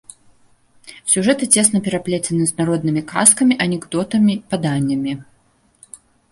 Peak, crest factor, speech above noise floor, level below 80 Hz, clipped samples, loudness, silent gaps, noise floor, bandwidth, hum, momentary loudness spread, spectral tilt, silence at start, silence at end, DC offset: 0 dBFS; 18 dB; 41 dB; -56 dBFS; under 0.1%; -16 LUFS; none; -58 dBFS; 16 kHz; none; 10 LU; -4 dB/octave; 0.85 s; 1.1 s; under 0.1%